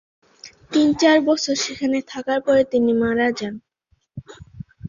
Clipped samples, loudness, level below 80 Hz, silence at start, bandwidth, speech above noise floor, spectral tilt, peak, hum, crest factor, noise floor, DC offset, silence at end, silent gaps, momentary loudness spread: under 0.1%; -19 LUFS; -54 dBFS; 0.45 s; 7.6 kHz; 47 dB; -4 dB/octave; -4 dBFS; none; 18 dB; -66 dBFS; under 0.1%; 0 s; none; 24 LU